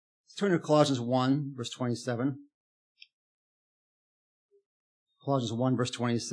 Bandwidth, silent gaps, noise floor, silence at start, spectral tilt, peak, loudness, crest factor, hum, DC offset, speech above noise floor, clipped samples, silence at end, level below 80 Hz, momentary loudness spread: 10.5 kHz; 2.54-2.96 s, 3.13-4.49 s, 4.66-5.06 s; under -90 dBFS; 0.35 s; -6 dB/octave; -10 dBFS; -29 LUFS; 22 dB; none; under 0.1%; over 61 dB; under 0.1%; 0 s; -84 dBFS; 11 LU